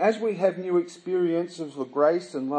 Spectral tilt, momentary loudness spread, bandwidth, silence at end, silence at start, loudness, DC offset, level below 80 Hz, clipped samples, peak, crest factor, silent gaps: -6.5 dB/octave; 8 LU; 9.6 kHz; 0 s; 0 s; -26 LUFS; under 0.1%; -84 dBFS; under 0.1%; -8 dBFS; 16 dB; none